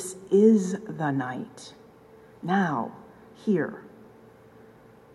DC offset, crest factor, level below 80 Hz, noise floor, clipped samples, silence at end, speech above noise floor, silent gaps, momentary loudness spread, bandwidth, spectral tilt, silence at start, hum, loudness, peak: under 0.1%; 20 dB; -70 dBFS; -52 dBFS; under 0.1%; 1.25 s; 28 dB; none; 21 LU; 12.5 kHz; -6.5 dB/octave; 0 s; none; -25 LUFS; -8 dBFS